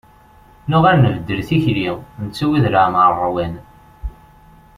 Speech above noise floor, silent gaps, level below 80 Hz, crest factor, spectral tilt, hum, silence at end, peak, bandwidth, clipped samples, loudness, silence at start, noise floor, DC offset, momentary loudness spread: 31 dB; none; -38 dBFS; 16 dB; -8 dB/octave; none; 0.65 s; -2 dBFS; 14 kHz; under 0.1%; -16 LUFS; 0.65 s; -47 dBFS; under 0.1%; 21 LU